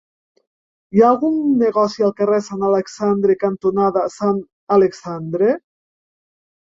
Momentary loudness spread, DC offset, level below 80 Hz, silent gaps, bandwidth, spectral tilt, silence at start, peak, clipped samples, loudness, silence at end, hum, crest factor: 6 LU; under 0.1%; -60 dBFS; 4.53-4.67 s; 7.8 kHz; -7 dB/octave; 0.95 s; -2 dBFS; under 0.1%; -17 LUFS; 1.1 s; none; 16 dB